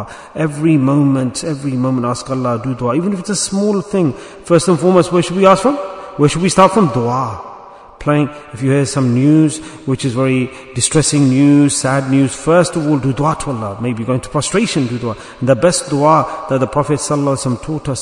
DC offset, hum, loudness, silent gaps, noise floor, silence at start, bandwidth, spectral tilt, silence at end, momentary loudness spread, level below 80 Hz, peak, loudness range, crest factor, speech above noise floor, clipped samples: under 0.1%; none; -14 LUFS; none; -36 dBFS; 0 s; 11 kHz; -5.5 dB/octave; 0 s; 10 LU; -44 dBFS; 0 dBFS; 3 LU; 14 dB; 22 dB; 0.2%